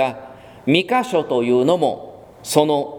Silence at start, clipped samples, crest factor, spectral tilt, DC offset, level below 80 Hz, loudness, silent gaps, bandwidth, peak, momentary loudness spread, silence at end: 0 s; under 0.1%; 18 dB; -5 dB/octave; under 0.1%; -60 dBFS; -18 LUFS; none; 19 kHz; 0 dBFS; 14 LU; 0 s